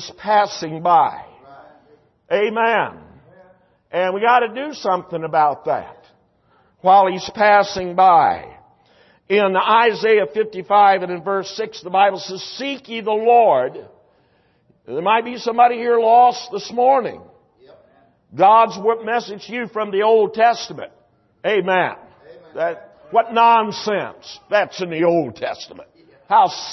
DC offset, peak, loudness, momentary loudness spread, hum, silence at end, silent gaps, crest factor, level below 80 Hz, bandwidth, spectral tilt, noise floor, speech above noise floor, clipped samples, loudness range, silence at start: under 0.1%; -2 dBFS; -17 LUFS; 14 LU; none; 0 s; none; 16 dB; -62 dBFS; 6.2 kHz; -4.5 dB/octave; -59 dBFS; 42 dB; under 0.1%; 4 LU; 0 s